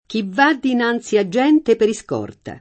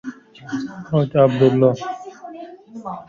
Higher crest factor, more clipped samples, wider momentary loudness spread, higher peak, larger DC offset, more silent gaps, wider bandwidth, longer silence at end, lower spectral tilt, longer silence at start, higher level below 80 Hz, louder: about the same, 16 dB vs 18 dB; neither; second, 11 LU vs 22 LU; about the same, -2 dBFS vs -2 dBFS; neither; neither; first, 8.8 kHz vs 7.4 kHz; about the same, 0 s vs 0.05 s; second, -5 dB/octave vs -8 dB/octave; about the same, 0.1 s vs 0.05 s; about the same, -56 dBFS vs -56 dBFS; about the same, -17 LUFS vs -18 LUFS